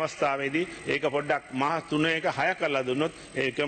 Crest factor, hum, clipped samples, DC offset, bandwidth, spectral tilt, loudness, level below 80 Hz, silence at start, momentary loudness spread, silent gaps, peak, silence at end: 16 dB; none; under 0.1%; under 0.1%; 8.8 kHz; -5 dB/octave; -28 LUFS; -62 dBFS; 0 s; 4 LU; none; -12 dBFS; 0 s